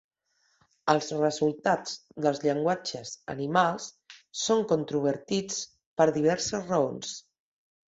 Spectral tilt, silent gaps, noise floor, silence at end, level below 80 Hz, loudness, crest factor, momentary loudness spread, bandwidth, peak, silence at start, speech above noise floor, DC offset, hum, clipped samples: -4.5 dB/octave; 5.86-5.96 s; -72 dBFS; 0.7 s; -68 dBFS; -28 LUFS; 22 dB; 13 LU; 8 kHz; -6 dBFS; 0.85 s; 44 dB; under 0.1%; none; under 0.1%